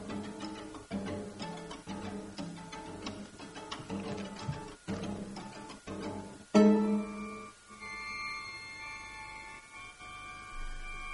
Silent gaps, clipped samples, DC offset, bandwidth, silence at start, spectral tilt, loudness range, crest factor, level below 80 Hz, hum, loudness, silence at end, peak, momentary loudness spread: none; under 0.1%; under 0.1%; 11.5 kHz; 0 s; -6 dB/octave; 10 LU; 24 dB; -54 dBFS; none; -37 LUFS; 0 s; -12 dBFS; 15 LU